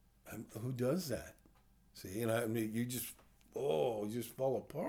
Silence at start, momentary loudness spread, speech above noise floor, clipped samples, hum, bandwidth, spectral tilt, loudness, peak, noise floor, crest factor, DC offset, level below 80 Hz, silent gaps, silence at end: 0.25 s; 16 LU; 29 dB; under 0.1%; none; over 20 kHz; -5.5 dB/octave; -39 LUFS; -24 dBFS; -67 dBFS; 16 dB; under 0.1%; -68 dBFS; none; 0 s